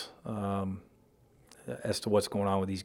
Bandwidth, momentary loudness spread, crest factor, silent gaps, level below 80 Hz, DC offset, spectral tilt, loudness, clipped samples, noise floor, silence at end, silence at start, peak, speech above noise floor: 17 kHz; 15 LU; 20 dB; none; -68 dBFS; under 0.1%; -5.5 dB/octave; -33 LUFS; under 0.1%; -64 dBFS; 0 s; 0 s; -14 dBFS; 32 dB